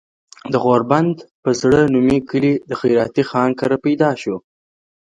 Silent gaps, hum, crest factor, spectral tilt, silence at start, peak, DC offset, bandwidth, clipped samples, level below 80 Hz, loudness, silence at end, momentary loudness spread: 1.31-1.43 s; none; 16 dB; -6.5 dB/octave; 0.45 s; 0 dBFS; under 0.1%; 9.4 kHz; under 0.1%; -48 dBFS; -17 LUFS; 0.65 s; 9 LU